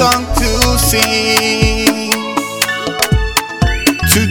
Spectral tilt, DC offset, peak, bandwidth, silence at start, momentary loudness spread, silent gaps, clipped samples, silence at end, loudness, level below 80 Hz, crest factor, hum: -3.5 dB/octave; under 0.1%; 0 dBFS; over 20 kHz; 0 s; 5 LU; none; 0.3%; 0 s; -13 LUFS; -22 dBFS; 14 dB; none